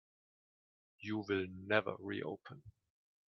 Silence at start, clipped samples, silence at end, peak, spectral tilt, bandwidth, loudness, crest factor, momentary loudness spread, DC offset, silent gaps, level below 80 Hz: 1 s; under 0.1%; 0.55 s; -14 dBFS; -4 dB/octave; 6.4 kHz; -39 LUFS; 28 dB; 16 LU; under 0.1%; none; -78 dBFS